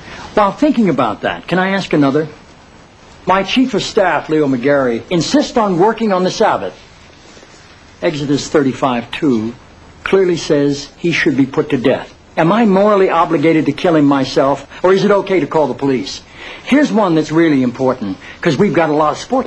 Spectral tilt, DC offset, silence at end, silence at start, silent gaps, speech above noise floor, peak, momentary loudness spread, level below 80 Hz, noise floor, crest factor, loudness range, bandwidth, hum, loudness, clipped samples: -6 dB/octave; under 0.1%; 0 s; 0 s; none; 28 dB; 0 dBFS; 8 LU; -46 dBFS; -41 dBFS; 14 dB; 4 LU; 11 kHz; none; -14 LUFS; under 0.1%